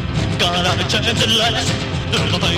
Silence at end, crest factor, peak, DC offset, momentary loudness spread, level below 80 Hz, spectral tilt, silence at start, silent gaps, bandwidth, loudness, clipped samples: 0 s; 14 dB; -4 dBFS; under 0.1%; 6 LU; -32 dBFS; -4 dB/octave; 0 s; none; 16 kHz; -16 LUFS; under 0.1%